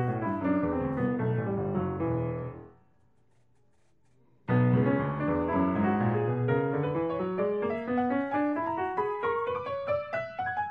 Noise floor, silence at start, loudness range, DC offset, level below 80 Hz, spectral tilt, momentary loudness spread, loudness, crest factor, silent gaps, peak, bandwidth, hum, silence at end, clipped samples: -70 dBFS; 0 s; 5 LU; under 0.1%; -56 dBFS; -10.5 dB/octave; 6 LU; -29 LUFS; 16 dB; none; -14 dBFS; 5 kHz; none; 0 s; under 0.1%